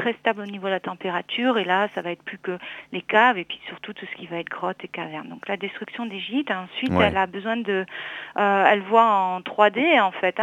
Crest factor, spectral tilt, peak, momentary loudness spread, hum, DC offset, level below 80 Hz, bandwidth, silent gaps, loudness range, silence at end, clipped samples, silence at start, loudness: 22 dB; -6.5 dB/octave; -2 dBFS; 15 LU; none; under 0.1%; -58 dBFS; 9.6 kHz; none; 7 LU; 0 s; under 0.1%; 0 s; -23 LUFS